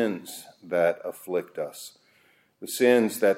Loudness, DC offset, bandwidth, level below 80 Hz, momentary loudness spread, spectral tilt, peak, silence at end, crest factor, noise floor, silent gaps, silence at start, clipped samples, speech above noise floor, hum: -26 LUFS; under 0.1%; 16.5 kHz; -78 dBFS; 21 LU; -4 dB/octave; -8 dBFS; 0 s; 20 dB; -63 dBFS; none; 0 s; under 0.1%; 37 dB; none